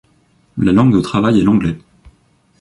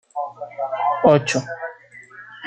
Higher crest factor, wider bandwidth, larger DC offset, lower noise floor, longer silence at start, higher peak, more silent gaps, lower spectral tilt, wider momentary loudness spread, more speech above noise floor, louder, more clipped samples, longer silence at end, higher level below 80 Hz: second, 14 dB vs 20 dB; first, 11.5 kHz vs 9.4 kHz; neither; first, -55 dBFS vs -43 dBFS; first, 0.55 s vs 0.15 s; about the same, -2 dBFS vs -2 dBFS; neither; first, -8 dB/octave vs -5.5 dB/octave; second, 14 LU vs 25 LU; first, 43 dB vs 23 dB; first, -14 LUFS vs -20 LUFS; neither; first, 0.8 s vs 0 s; first, -40 dBFS vs -60 dBFS